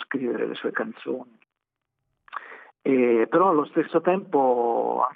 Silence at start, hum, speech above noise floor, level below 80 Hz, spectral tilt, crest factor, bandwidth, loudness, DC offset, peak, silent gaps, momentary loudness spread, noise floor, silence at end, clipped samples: 0 s; none; 61 dB; -78 dBFS; -9 dB/octave; 16 dB; 4 kHz; -23 LUFS; under 0.1%; -8 dBFS; none; 18 LU; -84 dBFS; 0.05 s; under 0.1%